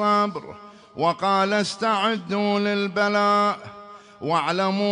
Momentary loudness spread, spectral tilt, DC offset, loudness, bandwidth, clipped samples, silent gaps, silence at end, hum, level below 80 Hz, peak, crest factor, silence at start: 16 LU; -5 dB/octave; under 0.1%; -22 LUFS; 10.5 kHz; under 0.1%; none; 0 s; none; -68 dBFS; -8 dBFS; 14 dB; 0 s